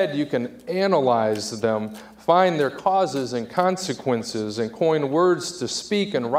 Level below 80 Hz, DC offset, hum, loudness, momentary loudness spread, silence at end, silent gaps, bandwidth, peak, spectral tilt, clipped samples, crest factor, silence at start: -64 dBFS; under 0.1%; none; -23 LUFS; 9 LU; 0 s; none; 15.5 kHz; -4 dBFS; -5 dB/octave; under 0.1%; 18 dB; 0 s